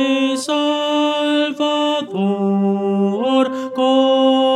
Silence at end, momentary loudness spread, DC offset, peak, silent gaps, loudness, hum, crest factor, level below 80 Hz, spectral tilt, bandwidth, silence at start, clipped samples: 0 s; 5 LU; under 0.1%; -2 dBFS; none; -17 LUFS; none; 14 dB; -72 dBFS; -5.5 dB/octave; 12.5 kHz; 0 s; under 0.1%